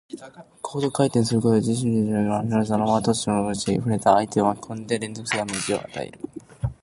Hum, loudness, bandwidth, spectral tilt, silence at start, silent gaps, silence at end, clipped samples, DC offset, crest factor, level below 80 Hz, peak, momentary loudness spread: none; -23 LUFS; 11.5 kHz; -5.5 dB/octave; 0.1 s; none; 0.1 s; under 0.1%; under 0.1%; 20 dB; -50 dBFS; -2 dBFS; 14 LU